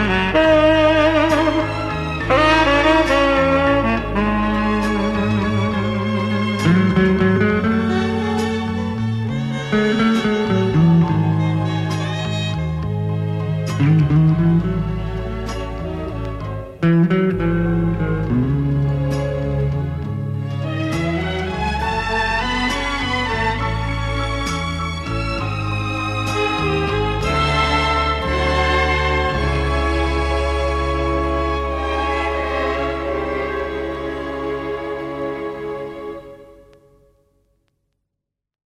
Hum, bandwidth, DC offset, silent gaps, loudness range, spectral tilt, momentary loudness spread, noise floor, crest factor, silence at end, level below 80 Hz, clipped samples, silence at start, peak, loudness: none; 12 kHz; under 0.1%; none; 7 LU; -6.5 dB/octave; 10 LU; -80 dBFS; 16 dB; 2.15 s; -30 dBFS; under 0.1%; 0 s; -4 dBFS; -19 LUFS